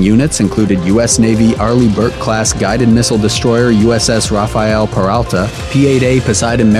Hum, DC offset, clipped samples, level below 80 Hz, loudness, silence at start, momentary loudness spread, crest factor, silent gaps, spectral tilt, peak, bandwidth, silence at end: none; 0.1%; under 0.1%; -28 dBFS; -11 LUFS; 0 s; 4 LU; 10 dB; none; -5 dB/octave; 0 dBFS; 14 kHz; 0 s